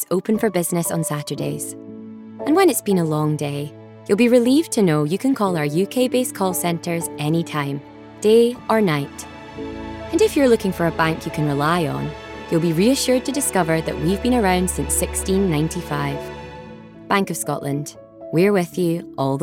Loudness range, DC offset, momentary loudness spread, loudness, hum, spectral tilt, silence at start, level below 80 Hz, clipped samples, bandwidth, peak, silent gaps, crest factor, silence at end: 4 LU; under 0.1%; 16 LU; -20 LUFS; none; -5 dB/octave; 0 s; -42 dBFS; under 0.1%; 17 kHz; -4 dBFS; none; 16 dB; 0 s